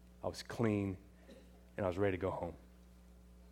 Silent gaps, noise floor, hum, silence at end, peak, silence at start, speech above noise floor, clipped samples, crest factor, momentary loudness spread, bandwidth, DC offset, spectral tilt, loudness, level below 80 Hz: none; -60 dBFS; none; 0 s; -20 dBFS; 0 s; 22 dB; under 0.1%; 20 dB; 23 LU; 16.5 kHz; under 0.1%; -7 dB/octave; -39 LUFS; -60 dBFS